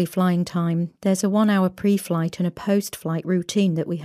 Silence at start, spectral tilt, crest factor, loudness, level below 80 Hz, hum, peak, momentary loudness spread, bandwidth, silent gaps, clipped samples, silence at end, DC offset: 0 s; -6.5 dB/octave; 14 dB; -22 LUFS; -62 dBFS; none; -8 dBFS; 6 LU; 15.5 kHz; none; under 0.1%; 0 s; under 0.1%